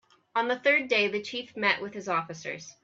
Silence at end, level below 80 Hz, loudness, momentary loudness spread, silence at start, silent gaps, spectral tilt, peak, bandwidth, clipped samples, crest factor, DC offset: 0.1 s; -76 dBFS; -27 LUFS; 13 LU; 0.35 s; none; -3.5 dB/octave; -10 dBFS; 7.8 kHz; under 0.1%; 20 dB; under 0.1%